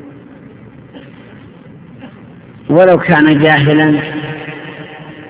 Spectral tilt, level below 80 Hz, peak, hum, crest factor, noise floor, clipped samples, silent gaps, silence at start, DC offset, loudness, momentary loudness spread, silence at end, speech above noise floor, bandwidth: -10.5 dB/octave; -48 dBFS; 0 dBFS; none; 14 dB; -36 dBFS; 0.4%; none; 0 s; under 0.1%; -10 LUFS; 21 LU; 0 s; 27 dB; 4 kHz